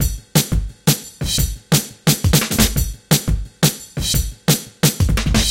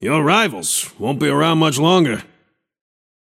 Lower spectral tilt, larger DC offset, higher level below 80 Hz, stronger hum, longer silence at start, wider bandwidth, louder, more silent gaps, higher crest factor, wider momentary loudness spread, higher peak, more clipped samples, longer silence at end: about the same, -4 dB/octave vs -4 dB/octave; neither; first, -24 dBFS vs -60 dBFS; neither; about the same, 0 s vs 0 s; about the same, 17 kHz vs 16.5 kHz; about the same, -18 LUFS vs -16 LUFS; neither; about the same, 18 dB vs 18 dB; about the same, 5 LU vs 6 LU; about the same, 0 dBFS vs 0 dBFS; neither; second, 0 s vs 1.05 s